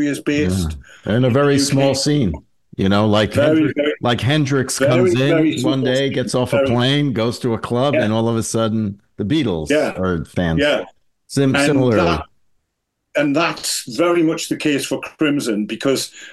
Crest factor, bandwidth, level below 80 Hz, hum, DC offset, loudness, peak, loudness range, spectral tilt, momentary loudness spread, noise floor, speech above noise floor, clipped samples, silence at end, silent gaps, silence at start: 16 dB; 12.5 kHz; -42 dBFS; none; 0.2%; -17 LUFS; -2 dBFS; 3 LU; -5.5 dB/octave; 7 LU; -74 dBFS; 57 dB; under 0.1%; 0 s; none; 0 s